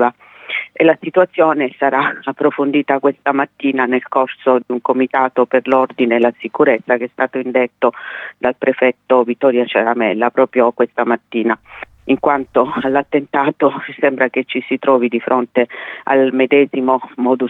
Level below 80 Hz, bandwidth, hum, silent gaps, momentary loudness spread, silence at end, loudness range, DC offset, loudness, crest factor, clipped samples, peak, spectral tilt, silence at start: -62 dBFS; 4.1 kHz; none; none; 6 LU; 0 s; 1 LU; under 0.1%; -15 LUFS; 14 dB; under 0.1%; 0 dBFS; -7.5 dB/octave; 0 s